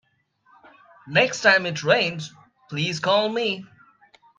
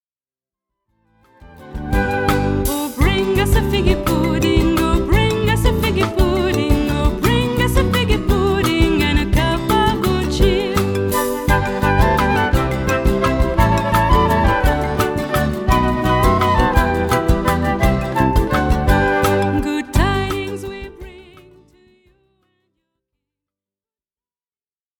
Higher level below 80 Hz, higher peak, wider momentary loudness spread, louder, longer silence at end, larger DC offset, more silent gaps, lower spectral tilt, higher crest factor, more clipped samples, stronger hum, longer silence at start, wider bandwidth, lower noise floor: second, -70 dBFS vs -22 dBFS; about the same, -2 dBFS vs -2 dBFS; first, 15 LU vs 4 LU; second, -21 LUFS vs -17 LUFS; second, 0.75 s vs 3.8 s; neither; neither; second, -3.5 dB/octave vs -6 dB/octave; first, 22 dB vs 14 dB; neither; neither; second, 1.05 s vs 1.55 s; second, 9.6 kHz vs over 20 kHz; second, -64 dBFS vs under -90 dBFS